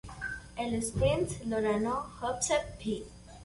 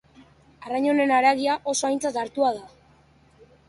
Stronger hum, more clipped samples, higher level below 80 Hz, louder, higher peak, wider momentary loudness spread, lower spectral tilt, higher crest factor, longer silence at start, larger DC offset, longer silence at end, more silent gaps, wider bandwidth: neither; neither; first, -48 dBFS vs -64 dBFS; second, -32 LUFS vs -23 LUFS; second, -16 dBFS vs -6 dBFS; about the same, 10 LU vs 11 LU; first, -4.5 dB/octave vs -2.5 dB/octave; about the same, 18 dB vs 18 dB; second, 0.05 s vs 0.6 s; neither; second, 0 s vs 1 s; neither; about the same, 11.5 kHz vs 11.5 kHz